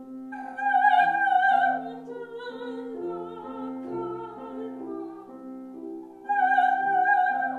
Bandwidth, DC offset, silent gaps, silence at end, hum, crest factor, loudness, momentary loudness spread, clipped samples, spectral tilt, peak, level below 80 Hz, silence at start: 4.4 kHz; under 0.1%; none; 0 s; none; 18 dB; -24 LUFS; 19 LU; under 0.1%; -5 dB/octave; -8 dBFS; -74 dBFS; 0 s